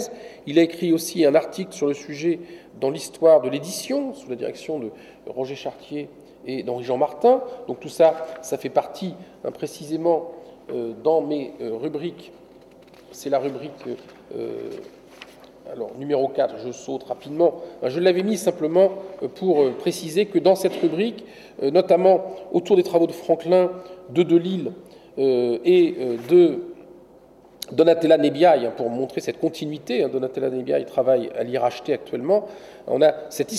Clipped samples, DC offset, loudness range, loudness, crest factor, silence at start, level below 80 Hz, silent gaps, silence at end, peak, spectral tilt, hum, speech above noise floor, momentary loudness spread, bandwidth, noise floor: under 0.1%; under 0.1%; 9 LU; -22 LUFS; 16 dB; 0 s; -66 dBFS; none; 0 s; -6 dBFS; -5.5 dB/octave; none; 28 dB; 16 LU; 14 kHz; -50 dBFS